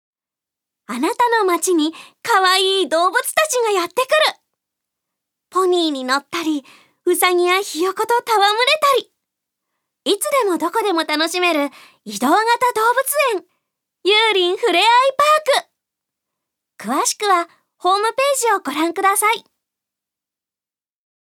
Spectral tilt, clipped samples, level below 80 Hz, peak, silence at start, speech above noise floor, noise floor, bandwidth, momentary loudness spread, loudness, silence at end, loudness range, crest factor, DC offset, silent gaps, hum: -1 dB/octave; under 0.1%; -80 dBFS; 0 dBFS; 0.9 s; over 73 dB; under -90 dBFS; 19 kHz; 9 LU; -17 LUFS; 1.8 s; 4 LU; 18 dB; under 0.1%; none; none